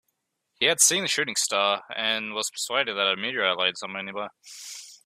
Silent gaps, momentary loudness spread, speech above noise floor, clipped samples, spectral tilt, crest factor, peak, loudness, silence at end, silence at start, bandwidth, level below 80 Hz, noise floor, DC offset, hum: none; 18 LU; 51 dB; under 0.1%; 0 dB/octave; 22 dB; -4 dBFS; -24 LUFS; 0.1 s; 0.6 s; 16 kHz; -76 dBFS; -77 dBFS; under 0.1%; none